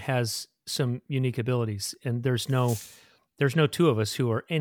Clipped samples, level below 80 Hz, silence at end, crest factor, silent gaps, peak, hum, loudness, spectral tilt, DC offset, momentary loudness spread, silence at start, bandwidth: under 0.1%; -68 dBFS; 0 s; 16 dB; none; -10 dBFS; none; -27 LUFS; -5.5 dB/octave; under 0.1%; 8 LU; 0 s; 18.5 kHz